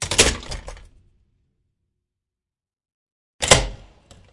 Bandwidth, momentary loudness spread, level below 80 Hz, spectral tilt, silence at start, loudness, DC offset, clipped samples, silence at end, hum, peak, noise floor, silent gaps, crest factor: 12 kHz; 19 LU; -36 dBFS; -2 dB/octave; 0 s; -17 LUFS; under 0.1%; under 0.1%; 0.6 s; none; 0 dBFS; -90 dBFS; 2.94-3.39 s; 26 dB